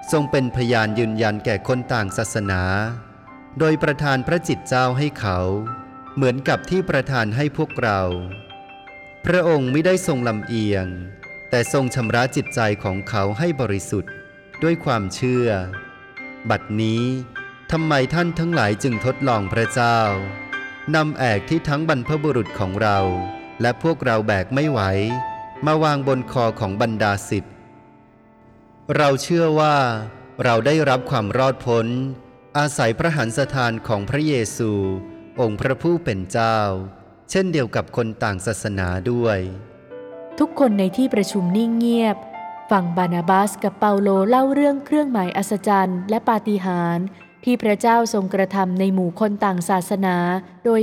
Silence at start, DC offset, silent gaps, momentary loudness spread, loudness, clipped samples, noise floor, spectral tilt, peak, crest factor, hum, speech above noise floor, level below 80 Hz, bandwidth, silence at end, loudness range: 0 s; under 0.1%; none; 11 LU; -20 LUFS; under 0.1%; -50 dBFS; -6 dB/octave; -4 dBFS; 16 dB; none; 30 dB; -50 dBFS; 16 kHz; 0 s; 4 LU